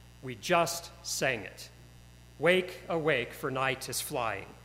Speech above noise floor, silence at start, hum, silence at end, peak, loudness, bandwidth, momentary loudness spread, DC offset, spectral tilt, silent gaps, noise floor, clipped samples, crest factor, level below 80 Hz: 22 dB; 0 s; 60 Hz at -55 dBFS; 0 s; -10 dBFS; -31 LUFS; 16 kHz; 13 LU; under 0.1%; -3.5 dB/octave; none; -54 dBFS; under 0.1%; 22 dB; -58 dBFS